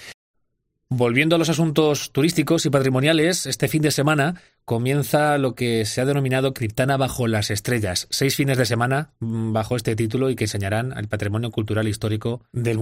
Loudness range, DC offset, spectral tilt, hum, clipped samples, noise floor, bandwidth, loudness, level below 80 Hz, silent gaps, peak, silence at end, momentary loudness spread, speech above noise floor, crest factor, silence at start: 4 LU; under 0.1%; -5 dB/octave; none; under 0.1%; -73 dBFS; 16 kHz; -21 LUFS; -52 dBFS; 0.14-0.34 s; -4 dBFS; 0 s; 7 LU; 52 dB; 16 dB; 0 s